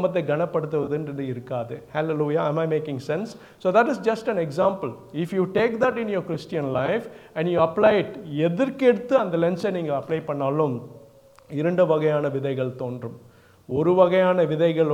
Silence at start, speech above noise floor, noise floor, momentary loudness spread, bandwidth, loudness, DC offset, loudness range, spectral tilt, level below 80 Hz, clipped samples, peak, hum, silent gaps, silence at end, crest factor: 0 s; 28 dB; -51 dBFS; 11 LU; 12.5 kHz; -23 LUFS; under 0.1%; 3 LU; -7.5 dB/octave; -64 dBFS; under 0.1%; -4 dBFS; none; none; 0 s; 18 dB